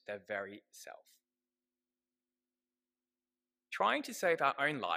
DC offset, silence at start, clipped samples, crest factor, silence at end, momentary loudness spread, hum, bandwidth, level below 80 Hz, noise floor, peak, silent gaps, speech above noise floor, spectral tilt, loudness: under 0.1%; 0.1 s; under 0.1%; 24 dB; 0 s; 21 LU; none; 15.5 kHz; under -90 dBFS; under -90 dBFS; -16 dBFS; none; over 54 dB; -3.5 dB/octave; -34 LUFS